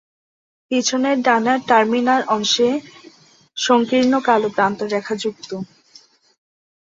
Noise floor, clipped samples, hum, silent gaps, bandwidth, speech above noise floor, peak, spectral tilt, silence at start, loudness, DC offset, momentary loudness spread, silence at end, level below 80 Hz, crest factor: -50 dBFS; under 0.1%; none; none; 7.8 kHz; 33 dB; -2 dBFS; -3 dB/octave; 0.7 s; -18 LUFS; under 0.1%; 12 LU; 1.15 s; -64 dBFS; 18 dB